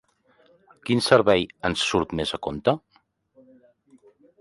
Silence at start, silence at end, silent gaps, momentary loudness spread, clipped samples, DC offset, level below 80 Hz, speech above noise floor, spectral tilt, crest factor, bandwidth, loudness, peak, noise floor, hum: 0.85 s; 1.65 s; none; 10 LU; under 0.1%; under 0.1%; -52 dBFS; 41 dB; -4.5 dB/octave; 22 dB; 11.5 kHz; -23 LUFS; -4 dBFS; -64 dBFS; none